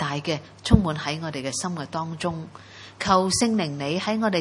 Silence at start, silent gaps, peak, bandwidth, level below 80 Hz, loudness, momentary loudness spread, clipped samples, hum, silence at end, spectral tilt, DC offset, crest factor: 0 s; none; 0 dBFS; 11.5 kHz; -40 dBFS; -25 LUFS; 10 LU; under 0.1%; none; 0 s; -4.5 dB/octave; under 0.1%; 24 dB